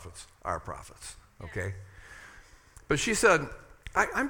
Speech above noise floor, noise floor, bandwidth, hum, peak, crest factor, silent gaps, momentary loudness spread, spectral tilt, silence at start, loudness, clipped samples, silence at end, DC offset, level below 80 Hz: 25 dB; -54 dBFS; 18 kHz; none; -8 dBFS; 24 dB; none; 25 LU; -3.5 dB/octave; 0 s; -29 LUFS; under 0.1%; 0 s; under 0.1%; -50 dBFS